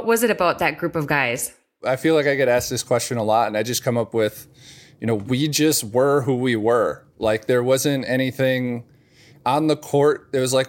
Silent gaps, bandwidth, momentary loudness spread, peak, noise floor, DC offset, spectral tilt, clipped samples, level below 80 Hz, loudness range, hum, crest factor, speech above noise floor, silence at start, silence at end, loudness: none; 17 kHz; 7 LU; -4 dBFS; -51 dBFS; under 0.1%; -4.5 dB/octave; under 0.1%; -56 dBFS; 2 LU; none; 16 dB; 31 dB; 0 s; 0 s; -20 LUFS